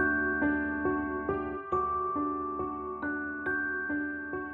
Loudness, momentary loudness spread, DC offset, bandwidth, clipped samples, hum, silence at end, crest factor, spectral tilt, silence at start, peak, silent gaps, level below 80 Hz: -32 LUFS; 7 LU; under 0.1%; 3.9 kHz; under 0.1%; none; 0 s; 14 dB; -9.5 dB/octave; 0 s; -16 dBFS; none; -52 dBFS